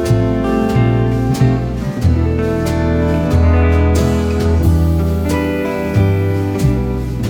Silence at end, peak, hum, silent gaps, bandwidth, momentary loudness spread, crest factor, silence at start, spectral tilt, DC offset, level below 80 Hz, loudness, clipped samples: 0 s; -2 dBFS; none; none; 17.5 kHz; 4 LU; 12 dB; 0 s; -7.5 dB/octave; under 0.1%; -24 dBFS; -15 LUFS; under 0.1%